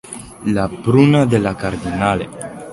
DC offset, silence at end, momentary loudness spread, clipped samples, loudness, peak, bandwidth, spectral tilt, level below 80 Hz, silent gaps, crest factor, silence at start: under 0.1%; 0 s; 16 LU; under 0.1%; -16 LUFS; 0 dBFS; 11.5 kHz; -7 dB/octave; -40 dBFS; none; 16 dB; 0.05 s